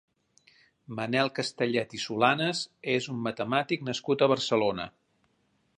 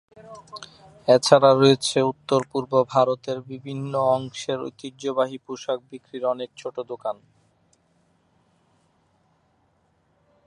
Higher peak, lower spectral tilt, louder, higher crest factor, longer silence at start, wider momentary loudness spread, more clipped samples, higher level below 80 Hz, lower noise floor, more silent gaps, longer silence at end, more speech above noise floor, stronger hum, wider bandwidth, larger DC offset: second, -8 dBFS vs 0 dBFS; about the same, -4.5 dB/octave vs -5 dB/octave; second, -28 LUFS vs -23 LUFS; about the same, 22 dB vs 24 dB; first, 0.9 s vs 0.25 s; second, 9 LU vs 20 LU; neither; about the same, -68 dBFS vs -68 dBFS; first, -72 dBFS vs -66 dBFS; neither; second, 0.9 s vs 3.35 s; about the same, 43 dB vs 44 dB; neither; about the same, 11 kHz vs 11.5 kHz; neither